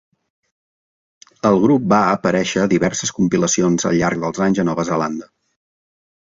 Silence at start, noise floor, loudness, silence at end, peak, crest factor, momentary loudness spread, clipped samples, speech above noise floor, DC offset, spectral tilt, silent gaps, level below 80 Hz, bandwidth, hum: 1.45 s; under -90 dBFS; -17 LUFS; 1.15 s; -2 dBFS; 16 dB; 6 LU; under 0.1%; over 73 dB; under 0.1%; -5 dB/octave; none; -52 dBFS; 7.8 kHz; none